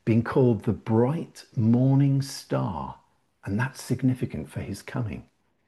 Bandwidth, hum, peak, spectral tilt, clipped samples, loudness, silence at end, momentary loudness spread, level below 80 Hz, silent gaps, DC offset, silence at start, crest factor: 12.5 kHz; none; -10 dBFS; -7.5 dB/octave; under 0.1%; -26 LUFS; 0.45 s; 14 LU; -54 dBFS; none; under 0.1%; 0.05 s; 16 dB